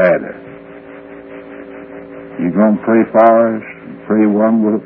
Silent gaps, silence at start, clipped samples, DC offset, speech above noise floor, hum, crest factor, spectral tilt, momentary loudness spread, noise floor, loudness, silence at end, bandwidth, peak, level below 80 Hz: none; 0 s; under 0.1%; under 0.1%; 22 dB; none; 14 dB; -11 dB/octave; 24 LU; -34 dBFS; -13 LUFS; 0 s; 3.4 kHz; 0 dBFS; -56 dBFS